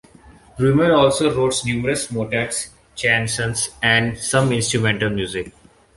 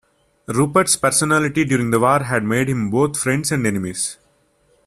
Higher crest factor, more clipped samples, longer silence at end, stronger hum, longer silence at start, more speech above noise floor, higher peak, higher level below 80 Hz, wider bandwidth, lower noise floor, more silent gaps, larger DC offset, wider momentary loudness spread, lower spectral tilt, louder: about the same, 18 dB vs 16 dB; neither; second, 0.45 s vs 0.7 s; neither; second, 0.25 s vs 0.5 s; second, 28 dB vs 42 dB; about the same, -2 dBFS vs -2 dBFS; first, -46 dBFS vs -52 dBFS; second, 12 kHz vs 15.5 kHz; second, -47 dBFS vs -60 dBFS; neither; neither; first, 10 LU vs 7 LU; about the same, -4 dB/octave vs -4.5 dB/octave; about the same, -19 LUFS vs -18 LUFS